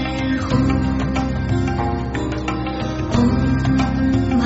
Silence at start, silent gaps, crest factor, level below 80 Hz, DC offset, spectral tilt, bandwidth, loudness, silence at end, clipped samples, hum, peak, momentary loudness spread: 0 s; none; 14 dB; -28 dBFS; under 0.1%; -6.5 dB/octave; 8 kHz; -20 LUFS; 0 s; under 0.1%; none; -4 dBFS; 6 LU